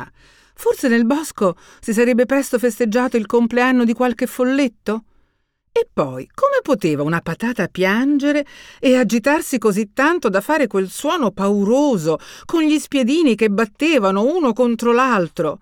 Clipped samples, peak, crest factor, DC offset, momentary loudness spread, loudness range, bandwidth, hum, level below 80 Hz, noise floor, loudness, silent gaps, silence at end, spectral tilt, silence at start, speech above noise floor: under 0.1%; -2 dBFS; 14 dB; under 0.1%; 7 LU; 3 LU; 19 kHz; none; -54 dBFS; -65 dBFS; -17 LUFS; none; 0.05 s; -5.5 dB/octave; 0 s; 48 dB